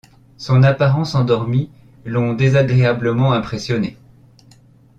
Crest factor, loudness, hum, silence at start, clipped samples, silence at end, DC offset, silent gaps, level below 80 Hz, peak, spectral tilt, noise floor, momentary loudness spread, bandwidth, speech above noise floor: 14 dB; -17 LUFS; none; 0.4 s; under 0.1%; 1.05 s; under 0.1%; none; -48 dBFS; -2 dBFS; -7.5 dB/octave; -48 dBFS; 11 LU; 7.4 kHz; 33 dB